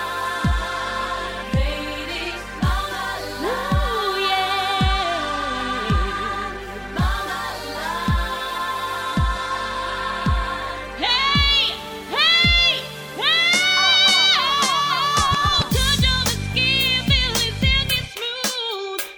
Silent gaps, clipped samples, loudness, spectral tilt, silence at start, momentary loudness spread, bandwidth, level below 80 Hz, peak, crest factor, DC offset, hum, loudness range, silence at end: none; under 0.1%; -19 LUFS; -3 dB/octave; 0 s; 12 LU; 19.5 kHz; -30 dBFS; -4 dBFS; 16 dB; under 0.1%; none; 9 LU; 0 s